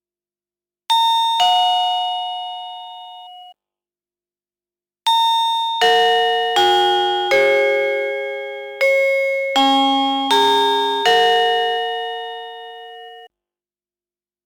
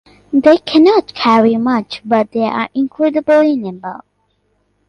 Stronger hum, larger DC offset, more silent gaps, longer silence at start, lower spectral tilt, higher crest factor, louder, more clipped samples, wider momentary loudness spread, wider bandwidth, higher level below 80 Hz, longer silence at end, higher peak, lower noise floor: second, 50 Hz at -80 dBFS vs 50 Hz at -50 dBFS; neither; neither; first, 0.9 s vs 0.3 s; second, -1 dB/octave vs -6.5 dB/octave; about the same, 10 dB vs 14 dB; second, -16 LUFS vs -13 LUFS; neither; first, 18 LU vs 9 LU; first, 19.5 kHz vs 9.6 kHz; second, -68 dBFS vs -56 dBFS; first, 1.2 s vs 0.9 s; second, -8 dBFS vs 0 dBFS; first, under -90 dBFS vs -62 dBFS